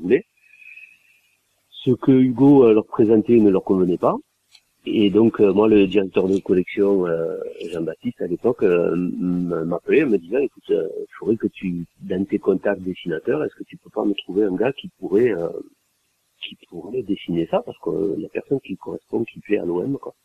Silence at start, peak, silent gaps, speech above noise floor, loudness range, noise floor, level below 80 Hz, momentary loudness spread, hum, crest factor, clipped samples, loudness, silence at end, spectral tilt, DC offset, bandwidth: 0 s; -4 dBFS; none; 49 dB; 8 LU; -68 dBFS; -58 dBFS; 14 LU; none; 16 dB; under 0.1%; -20 LUFS; 0.15 s; -8.5 dB/octave; under 0.1%; 7.2 kHz